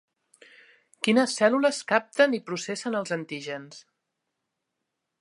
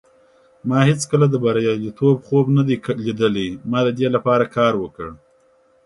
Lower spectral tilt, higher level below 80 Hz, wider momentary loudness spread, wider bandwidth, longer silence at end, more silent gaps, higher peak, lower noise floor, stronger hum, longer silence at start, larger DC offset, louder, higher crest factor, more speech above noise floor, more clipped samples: second, -4 dB/octave vs -6.5 dB/octave; second, -82 dBFS vs -54 dBFS; first, 13 LU vs 8 LU; about the same, 11.5 kHz vs 11.5 kHz; first, 1.4 s vs 0.7 s; neither; second, -6 dBFS vs -2 dBFS; first, -82 dBFS vs -56 dBFS; neither; first, 1 s vs 0.65 s; neither; second, -25 LUFS vs -18 LUFS; about the same, 22 dB vs 18 dB; first, 57 dB vs 39 dB; neither